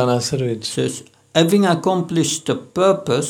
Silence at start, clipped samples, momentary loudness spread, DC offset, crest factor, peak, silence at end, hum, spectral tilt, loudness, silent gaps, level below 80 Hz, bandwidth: 0 s; under 0.1%; 8 LU; under 0.1%; 18 dB; 0 dBFS; 0 s; none; -5 dB/octave; -18 LUFS; none; -58 dBFS; 17 kHz